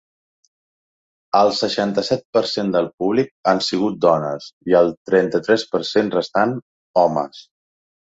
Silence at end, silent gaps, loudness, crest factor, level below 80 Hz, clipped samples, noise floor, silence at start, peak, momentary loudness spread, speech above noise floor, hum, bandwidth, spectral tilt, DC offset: 0.75 s; 2.25-2.33 s, 2.94-2.98 s, 3.31-3.43 s, 4.53-4.61 s, 4.97-5.05 s, 6.62-6.94 s; -19 LUFS; 18 dB; -60 dBFS; under 0.1%; under -90 dBFS; 1.35 s; -2 dBFS; 5 LU; over 72 dB; none; 8 kHz; -5.5 dB/octave; under 0.1%